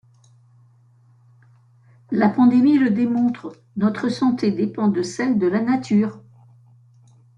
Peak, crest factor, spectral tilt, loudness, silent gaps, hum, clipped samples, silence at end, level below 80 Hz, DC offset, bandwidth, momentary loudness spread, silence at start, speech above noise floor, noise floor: -6 dBFS; 16 dB; -7 dB/octave; -19 LUFS; none; none; under 0.1%; 1.2 s; -64 dBFS; under 0.1%; 9.4 kHz; 8 LU; 2.1 s; 36 dB; -54 dBFS